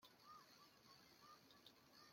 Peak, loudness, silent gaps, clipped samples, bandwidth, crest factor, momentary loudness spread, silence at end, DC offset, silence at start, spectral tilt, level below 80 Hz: -50 dBFS; -67 LUFS; none; under 0.1%; 16.5 kHz; 18 dB; 3 LU; 0 s; under 0.1%; 0 s; -2.5 dB/octave; under -90 dBFS